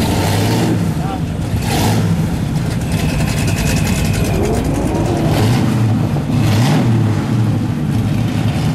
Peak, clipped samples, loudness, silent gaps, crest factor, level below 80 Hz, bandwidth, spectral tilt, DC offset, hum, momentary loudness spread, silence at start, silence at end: -2 dBFS; under 0.1%; -16 LUFS; none; 12 dB; -28 dBFS; 15.5 kHz; -6 dB/octave; under 0.1%; none; 5 LU; 0 s; 0 s